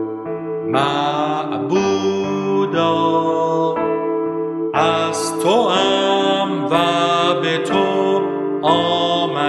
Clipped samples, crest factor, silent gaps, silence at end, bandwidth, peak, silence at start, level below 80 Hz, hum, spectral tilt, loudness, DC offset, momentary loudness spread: under 0.1%; 16 dB; none; 0 s; 12.5 kHz; -2 dBFS; 0 s; -58 dBFS; none; -5 dB/octave; -17 LUFS; under 0.1%; 5 LU